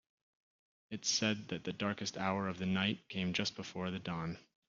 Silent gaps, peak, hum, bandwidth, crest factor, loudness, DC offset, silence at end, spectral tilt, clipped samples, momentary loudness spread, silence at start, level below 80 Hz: none; -18 dBFS; none; 7.4 kHz; 20 dB; -37 LUFS; under 0.1%; 0.25 s; -3.5 dB/octave; under 0.1%; 8 LU; 0.9 s; -72 dBFS